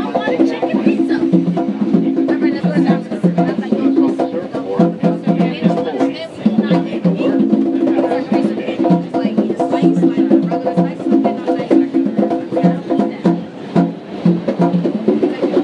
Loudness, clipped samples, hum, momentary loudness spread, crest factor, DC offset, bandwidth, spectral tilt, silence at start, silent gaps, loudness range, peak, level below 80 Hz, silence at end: -16 LUFS; under 0.1%; none; 4 LU; 14 dB; under 0.1%; 8.6 kHz; -9 dB/octave; 0 s; none; 1 LU; 0 dBFS; -64 dBFS; 0 s